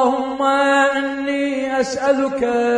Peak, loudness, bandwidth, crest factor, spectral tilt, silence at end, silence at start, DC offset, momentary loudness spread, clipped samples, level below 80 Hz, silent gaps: -4 dBFS; -18 LUFS; 10 kHz; 14 dB; -3.5 dB/octave; 0 s; 0 s; under 0.1%; 6 LU; under 0.1%; -54 dBFS; none